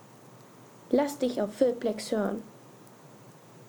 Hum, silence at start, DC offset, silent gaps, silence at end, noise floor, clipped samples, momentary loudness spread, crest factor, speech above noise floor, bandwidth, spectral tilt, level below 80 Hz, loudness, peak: none; 0.15 s; under 0.1%; none; 0 s; -52 dBFS; under 0.1%; 24 LU; 20 dB; 24 dB; over 20 kHz; -5.5 dB/octave; -68 dBFS; -29 LUFS; -12 dBFS